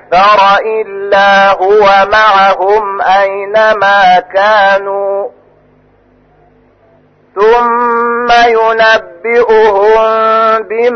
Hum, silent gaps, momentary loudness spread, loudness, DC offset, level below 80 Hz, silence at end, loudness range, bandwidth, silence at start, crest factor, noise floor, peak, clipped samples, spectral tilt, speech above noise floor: none; none; 6 LU; -8 LUFS; under 0.1%; -42 dBFS; 0 s; 7 LU; 6.6 kHz; 0.1 s; 8 dB; -47 dBFS; 0 dBFS; under 0.1%; -3.5 dB/octave; 39 dB